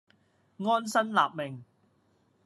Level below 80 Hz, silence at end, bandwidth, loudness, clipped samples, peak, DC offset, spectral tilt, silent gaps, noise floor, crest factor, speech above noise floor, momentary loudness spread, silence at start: -86 dBFS; 0.85 s; 13 kHz; -29 LUFS; under 0.1%; -10 dBFS; under 0.1%; -4.5 dB/octave; none; -69 dBFS; 22 dB; 41 dB; 13 LU; 0.6 s